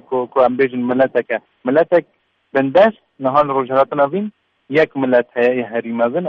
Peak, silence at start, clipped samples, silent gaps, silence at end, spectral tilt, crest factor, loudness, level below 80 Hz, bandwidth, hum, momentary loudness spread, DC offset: -2 dBFS; 0.1 s; under 0.1%; none; 0 s; -8 dB/octave; 14 dB; -16 LUFS; -58 dBFS; 6 kHz; none; 8 LU; under 0.1%